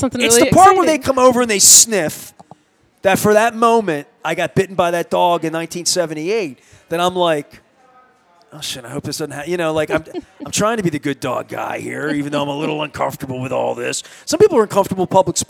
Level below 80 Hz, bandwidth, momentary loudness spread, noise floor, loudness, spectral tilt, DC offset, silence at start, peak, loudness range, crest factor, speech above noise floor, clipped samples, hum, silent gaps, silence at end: -50 dBFS; over 20 kHz; 15 LU; -57 dBFS; -15 LUFS; -3 dB/octave; under 0.1%; 0 s; 0 dBFS; 10 LU; 16 dB; 41 dB; under 0.1%; none; none; 0.05 s